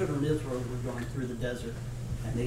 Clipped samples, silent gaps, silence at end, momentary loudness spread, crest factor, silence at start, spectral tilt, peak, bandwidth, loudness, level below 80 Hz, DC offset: under 0.1%; none; 0 s; 7 LU; 16 dB; 0 s; -7 dB/octave; -18 dBFS; 15.5 kHz; -34 LUFS; -44 dBFS; under 0.1%